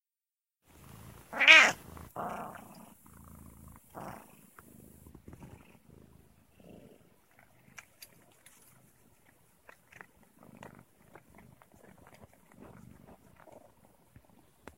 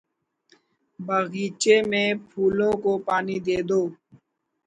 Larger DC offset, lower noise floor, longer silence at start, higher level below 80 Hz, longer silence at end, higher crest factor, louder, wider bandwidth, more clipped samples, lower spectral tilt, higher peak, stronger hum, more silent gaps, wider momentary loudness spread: neither; first, under -90 dBFS vs -63 dBFS; first, 1.3 s vs 1 s; second, -66 dBFS vs -60 dBFS; first, 10.65 s vs 0.75 s; first, 32 dB vs 20 dB; about the same, -22 LUFS vs -23 LUFS; first, 16 kHz vs 9.6 kHz; neither; second, -1 dB/octave vs -4.5 dB/octave; about the same, -2 dBFS vs -4 dBFS; neither; neither; first, 35 LU vs 7 LU